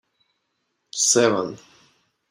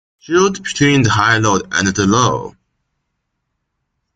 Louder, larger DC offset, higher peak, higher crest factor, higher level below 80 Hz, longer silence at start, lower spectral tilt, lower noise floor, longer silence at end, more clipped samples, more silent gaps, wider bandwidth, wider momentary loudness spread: second, -19 LUFS vs -14 LUFS; neither; second, -4 dBFS vs 0 dBFS; first, 22 dB vs 16 dB; second, -72 dBFS vs -46 dBFS; first, 0.95 s vs 0.3 s; second, -2 dB/octave vs -4.5 dB/octave; about the same, -74 dBFS vs -72 dBFS; second, 0.75 s vs 1.65 s; neither; neither; first, 16 kHz vs 9.2 kHz; first, 18 LU vs 5 LU